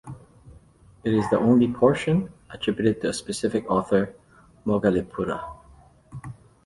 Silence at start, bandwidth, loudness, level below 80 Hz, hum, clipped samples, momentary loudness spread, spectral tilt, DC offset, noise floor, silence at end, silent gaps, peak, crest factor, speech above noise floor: 0.05 s; 11.5 kHz; -24 LUFS; -52 dBFS; none; under 0.1%; 21 LU; -6.5 dB/octave; under 0.1%; -53 dBFS; 0.3 s; none; -4 dBFS; 20 dB; 30 dB